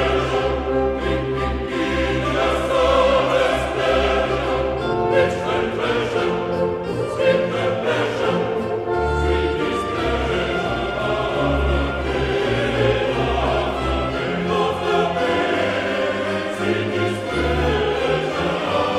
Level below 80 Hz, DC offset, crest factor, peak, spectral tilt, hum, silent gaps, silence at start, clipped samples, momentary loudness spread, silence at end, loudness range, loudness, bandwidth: -32 dBFS; under 0.1%; 14 dB; -4 dBFS; -6 dB/octave; none; none; 0 s; under 0.1%; 4 LU; 0 s; 2 LU; -20 LUFS; 13.5 kHz